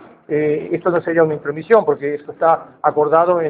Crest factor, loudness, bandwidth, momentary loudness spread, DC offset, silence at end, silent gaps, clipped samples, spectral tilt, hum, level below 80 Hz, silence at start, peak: 16 dB; -17 LUFS; 4.4 kHz; 8 LU; under 0.1%; 0 s; none; under 0.1%; -10.5 dB/octave; none; -62 dBFS; 0.3 s; 0 dBFS